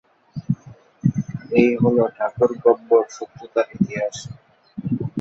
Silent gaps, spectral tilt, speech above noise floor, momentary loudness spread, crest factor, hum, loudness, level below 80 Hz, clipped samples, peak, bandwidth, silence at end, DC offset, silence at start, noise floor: none; -7.5 dB/octave; 25 dB; 18 LU; 18 dB; none; -21 LUFS; -54 dBFS; under 0.1%; -2 dBFS; 8 kHz; 0 s; under 0.1%; 0.35 s; -44 dBFS